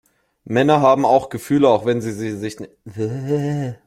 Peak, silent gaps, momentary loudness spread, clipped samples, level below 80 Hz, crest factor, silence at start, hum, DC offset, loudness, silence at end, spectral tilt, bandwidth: -2 dBFS; none; 14 LU; under 0.1%; -56 dBFS; 18 dB; 0.45 s; none; under 0.1%; -18 LUFS; 0.1 s; -7 dB/octave; 16 kHz